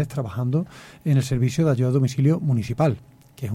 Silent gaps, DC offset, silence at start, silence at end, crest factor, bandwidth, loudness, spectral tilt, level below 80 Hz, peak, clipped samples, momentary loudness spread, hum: none; under 0.1%; 0 s; 0 s; 14 dB; 14 kHz; -22 LUFS; -7.5 dB/octave; -50 dBFS; -8 dBFS; under 0.1%; 11 LU; none